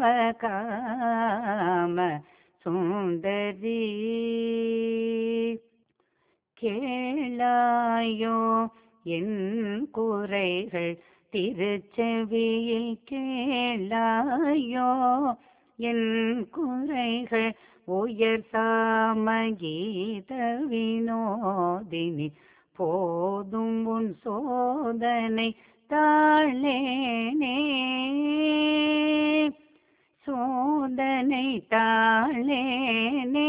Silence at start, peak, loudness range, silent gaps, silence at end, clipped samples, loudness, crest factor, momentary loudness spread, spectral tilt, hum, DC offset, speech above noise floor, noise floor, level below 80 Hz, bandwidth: 0 s; -10 dBFS; 5 LU; none; 0 s; under 0.1%; -27 LUFS; 18 dB; 8 LU; -3 dB/octave; none; under 0.1%; 46 dB; -72 dBFS; -68 dBFS; 4 kHz